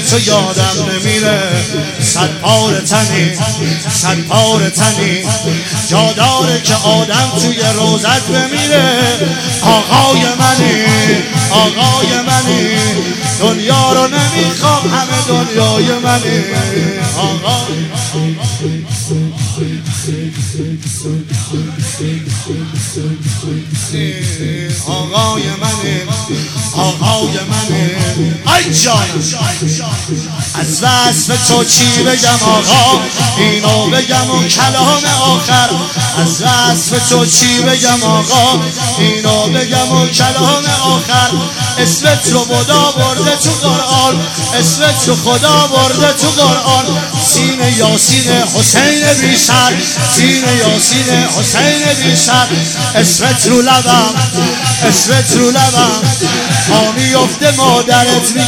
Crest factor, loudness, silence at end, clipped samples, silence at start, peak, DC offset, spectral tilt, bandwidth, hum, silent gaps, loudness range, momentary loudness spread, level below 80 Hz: 10 dB; -10 LUFS; 0 s; under 0.1%; 0 s; 0 dBFS; under 0.1%; -3.5 dB/octave; 19 kHz; none; none; 7 LU; 9 LU; -44 dBFS